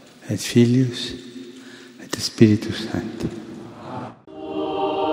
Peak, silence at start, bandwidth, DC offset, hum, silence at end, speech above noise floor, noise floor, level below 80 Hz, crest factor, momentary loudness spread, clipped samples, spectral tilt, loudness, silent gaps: 0 dBFS; 0.2 s; 16 kHz; under 0.1%; none; 0 s; 22 dB; -42 dBFS; -54 dBFS; 22 dB; 22 LU; under 0.1%; -6 dB/octave; -21 LUFS; none